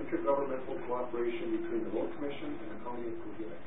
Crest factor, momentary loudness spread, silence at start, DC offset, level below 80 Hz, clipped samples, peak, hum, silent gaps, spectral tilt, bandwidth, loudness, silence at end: 18 dB; 10 LU; 0 s; 1%; -64 dBFS; under 0.1%; -18 dBFS; none; none; -3 dB/octave; 3.8 kHz; -36 LUFS; 0 s